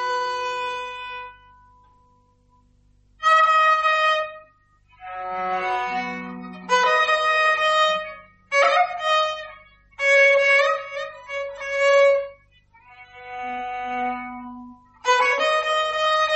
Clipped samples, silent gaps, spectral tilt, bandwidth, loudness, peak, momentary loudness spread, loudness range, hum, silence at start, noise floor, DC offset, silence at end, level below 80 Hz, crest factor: under 0.1%; none; -1.5 dB/octave; 8.4 kHz; -20 LUFS; -6 dBFS; 19 LU; 5 LU; 50 Hz at -65 dBFS; 0 s; -59 dBFS; under 0.1%; 0 s; -60 dBFS; 16 dB